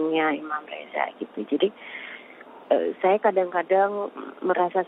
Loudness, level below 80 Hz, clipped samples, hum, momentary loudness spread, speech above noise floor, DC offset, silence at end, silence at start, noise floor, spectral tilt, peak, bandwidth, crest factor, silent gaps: -25 LUFS; -76 dBFS; under 0.1%; none; 15 LU; 21 dB; under 0.1%; 0 s; 0 s; -46 dBFS; -8 dB/octave; -8 dBFS; 4 kHz; 18 dB; none